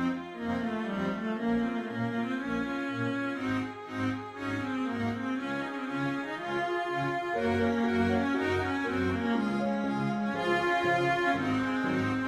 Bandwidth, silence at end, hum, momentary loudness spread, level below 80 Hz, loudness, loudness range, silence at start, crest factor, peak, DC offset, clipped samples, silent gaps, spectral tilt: 12 kHz; 0 s; none; 7 LU; -60 dBFS; -31 LUFS; 4 LU; 0 s; 16 dB; -14 dBFS; under 0.1%; under 0.1%; none; -6.5 dB/octave